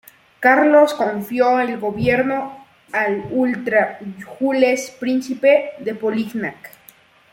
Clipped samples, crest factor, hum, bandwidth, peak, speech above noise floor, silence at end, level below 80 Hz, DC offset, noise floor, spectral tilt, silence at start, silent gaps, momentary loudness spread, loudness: under 0.1%; 18 dB; none; 17 kHz; -2 dBFS; 32 dB; 0.65 s; -54 dBFS; under 0.1%; -50 dBFS; -5.5 dB/octave; 0.4 s; none; 12 LU; -18 LUFS